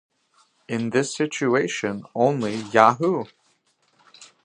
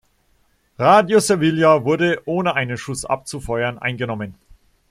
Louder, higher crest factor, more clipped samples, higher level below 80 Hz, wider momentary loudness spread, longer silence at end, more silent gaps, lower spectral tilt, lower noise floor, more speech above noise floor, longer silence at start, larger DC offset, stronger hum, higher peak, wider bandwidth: second, -22 LUFS vs -18 LUFS; first, 24 dB vs 18 dB; neither; second, -68 dBFS vs -48 dBFS; about the same, 11 LU vs 12 LU; second, 0.2 s vs 0.55 s; neither; about the same, -5 dB/octave vs -5 dB/octave; first, -66 dBFS vs -61 dBFS; about the same, 44 dB vs 43 dB; about the same, 0.7 s vs 0.8 s; neither; neither; about the same, 0 dBFS vs -2 dBFS; second, 10.5 kHz vs 15 kHz